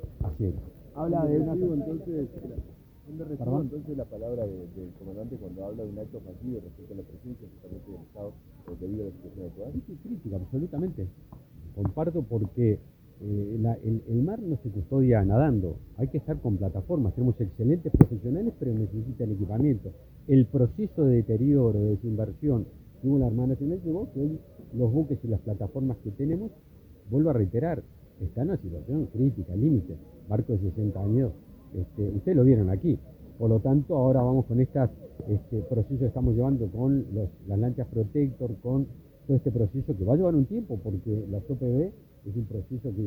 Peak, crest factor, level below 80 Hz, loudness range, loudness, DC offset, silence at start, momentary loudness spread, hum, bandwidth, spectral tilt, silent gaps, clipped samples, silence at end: 0 dBFS; 28 dB; -44 dBFS; 12 LU; -28 LUFS; under 0.1%; 0 s; 17 LU; none; 19.5 kHz; -12.5 dB/octave; none; under 0.1%; 0 s